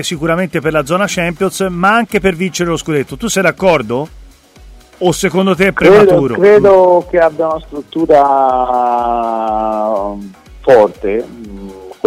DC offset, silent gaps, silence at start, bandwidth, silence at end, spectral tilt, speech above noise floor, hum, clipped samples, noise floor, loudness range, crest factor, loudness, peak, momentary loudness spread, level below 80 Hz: under 0.1%; none; 0 s; 16 kHz; 0.15 s; -5 dB/octave; 27 dB; none; under 0.1%; -38 dBFS; 6 LU; 12 dB; -12 LUFS; 0 dBFS; 13 LU; -38 dBFS